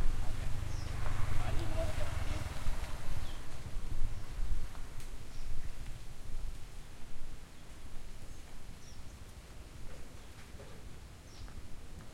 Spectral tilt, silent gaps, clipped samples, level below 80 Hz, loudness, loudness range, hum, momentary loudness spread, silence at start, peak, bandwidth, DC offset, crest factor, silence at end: -5 dB/octave; none; under 0.1%; -38 dBFS; -45 LUFS; 12 LU; none; 14 LU; 0 s; -16 dBFS; 11.5 kHz; under 0.1%; 16 dB; 0 s